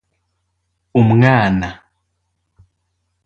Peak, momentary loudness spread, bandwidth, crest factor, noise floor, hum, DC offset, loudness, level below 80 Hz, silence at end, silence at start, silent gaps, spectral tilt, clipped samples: 0 dBFS; 10 LU; 7 kHz; 18 dB; -70 dBFS; none; under 0.1%; -14 LUFS; -44 dBFS; 1.5 s; 0.95 s; none; -8.5 dB/octave; under 0.1%